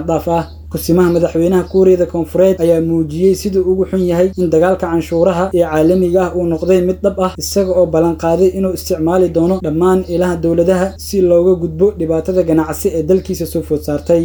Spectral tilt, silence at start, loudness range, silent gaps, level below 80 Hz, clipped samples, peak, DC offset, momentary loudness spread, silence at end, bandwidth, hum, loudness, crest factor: -7 dB/octave; 0 s; 1 LU; none; -34 dBFS; under 0.1%; 0 dBFS; under 0.1%; 6 LU; 0 s; over 20 kHz; none; -13 LUFS; 12 dB